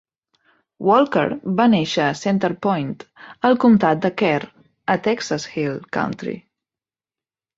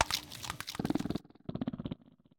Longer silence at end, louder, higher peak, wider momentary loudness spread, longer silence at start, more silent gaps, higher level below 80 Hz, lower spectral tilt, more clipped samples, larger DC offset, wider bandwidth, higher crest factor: first, 1.2 s vs 0.45 s; first, -19 LUFS vs -38 LUFS; first, -2 dBFS vs -6 dBFS; first, 14 LU vs 10 LU; first, 0.8 s vs 0 s; neither; about the same, -60 dBFS vs -58 dBFS; first, -6 dB/octave vs -4 dB/octave; neither; neither; second, 7.8 kHz vs 18 kHz; second, 18 dB vs 30 dB